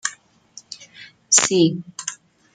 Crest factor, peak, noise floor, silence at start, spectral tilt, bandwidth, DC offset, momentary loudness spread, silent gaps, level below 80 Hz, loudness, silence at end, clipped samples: 22 dB; 0 dBFS; -48 dBFS; 0.05 s; -2.5 dB/octave; 9.6 kHz; under 0.1%; 23 LU; none; -66 dBFS; -18 LUFS; 0.4 s; under 0.1%